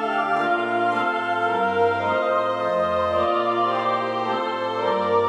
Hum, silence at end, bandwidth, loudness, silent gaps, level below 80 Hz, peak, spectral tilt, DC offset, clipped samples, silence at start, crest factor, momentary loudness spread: none; 0 s; 10.5 kHz; -22 LUFS; none; -60 dBFS; -8 dBFS; -6 dB/octave; under 0.1%; under 0.1%; 0 s; 12 dB; 3 LU